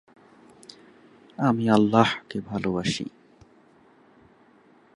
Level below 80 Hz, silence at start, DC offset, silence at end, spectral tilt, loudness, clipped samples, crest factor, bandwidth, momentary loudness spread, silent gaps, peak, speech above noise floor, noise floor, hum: -60 dBFS; 1.4 s; under 0.1%; 1.85 s; -6 dB/octave; -24 LUFS; under 0.1%; 24 dB; 11 kHz; 27 LU; none; -4 dBFS; 34 dB; -57 dBFS; none